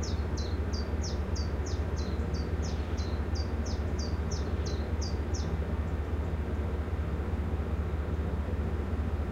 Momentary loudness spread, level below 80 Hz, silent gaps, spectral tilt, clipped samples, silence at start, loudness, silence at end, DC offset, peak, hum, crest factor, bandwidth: 1 LU; -34 dBFS; none; -6.5 dB/octave; under 0.1%; 0 s; -33 LUFS; 0 s; under 0.1%; -20 dBFS; none; 12 dB; 7.4 kHz